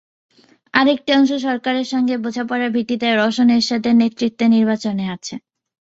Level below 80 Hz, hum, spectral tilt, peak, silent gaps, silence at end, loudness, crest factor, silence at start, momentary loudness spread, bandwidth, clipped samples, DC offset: -62 dBFS; none; -5 dB/octave; -2 dBFS; none; 0.45 s; -17 LUFS; 16 dB; 0.75 s; 8 LU; 7.8 kHz; under 0.1%; under 0.1%